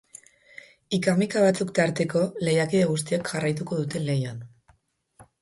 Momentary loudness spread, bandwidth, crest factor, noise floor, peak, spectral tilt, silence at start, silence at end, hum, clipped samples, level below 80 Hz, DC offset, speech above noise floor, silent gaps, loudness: 7 LU; 11.5 kHz; 18 dB; -63 dBFS; -8 dBFS; -5.5 dB/octave; 0.9 s; 0.2 s; none; under 0.1%; -62 dBFS; under 0.1%; 39 dB; none; -25 LUFS